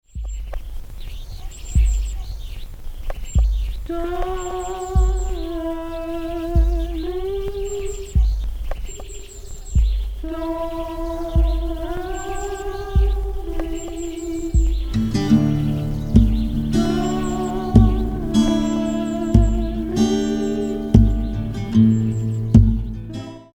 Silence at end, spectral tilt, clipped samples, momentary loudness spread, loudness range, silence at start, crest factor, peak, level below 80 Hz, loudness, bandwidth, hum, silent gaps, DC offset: 0.1 s; -7.5 dB/octave; under 0.1%; 17 LU; 7 LU; 0.15 s; 20 dB; 0 dBFS; -22 dBFS; -21 LUFS; 15 kHz; none; none; under 0.1%